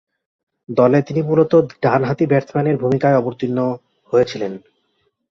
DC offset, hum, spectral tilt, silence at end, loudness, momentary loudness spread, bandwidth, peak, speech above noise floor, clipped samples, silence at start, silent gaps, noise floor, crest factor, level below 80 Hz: under 0.1%; none; -8.5 dB/octave; 0.7 s; -17 LUFS; 9 LU; 7 kHz; -2 dBFS; 50 dB; under 0.1%; 0.7 s; none; -67 dBFS; 16 dB; -56 dBFS